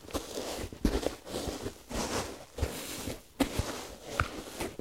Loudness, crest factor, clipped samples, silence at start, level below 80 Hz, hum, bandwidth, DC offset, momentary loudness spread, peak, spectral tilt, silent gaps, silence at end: -36 LUFS; 26 dB; under 0.1%; 0 s; -44 dBFS; none; 16 kHz; under 0.1%; 7 LU; -10 dBFS; -4 dB/octave; none; 0 s